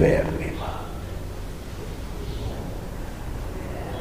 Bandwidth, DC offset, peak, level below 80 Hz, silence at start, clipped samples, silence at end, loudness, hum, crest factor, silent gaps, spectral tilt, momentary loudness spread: 15.5 kHz; 0.6%; -6 dBFS; -34 dBFS; 0 s; under 0.1%; 0 s; -31 LUFS; none; 22 dB; none; -6.5 dB/octave; 9 LU